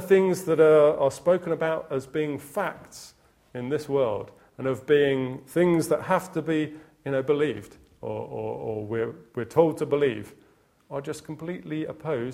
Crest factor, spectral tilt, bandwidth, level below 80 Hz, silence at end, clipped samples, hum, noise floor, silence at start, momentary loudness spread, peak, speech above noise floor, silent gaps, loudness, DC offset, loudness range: 20 dB; -6.5 dB/octave; 16 kHz; -64 dBFS; 0 s; under 0.1%; none; -61 dBFS; 0 s; 15 LU; -6 dBFS; 36 dB; none; -26 LUFS; under 0.1%; 5 LU